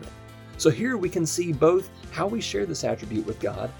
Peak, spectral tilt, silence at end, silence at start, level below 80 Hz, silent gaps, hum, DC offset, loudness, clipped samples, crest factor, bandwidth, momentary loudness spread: -6 dBFS; -5 dB/octave; 0 s; 0 s; -50 dBFS; none; none; under 0.1%; -25 LUFS; under 0.1%; 20 dB; over 20 kHz; 13 LU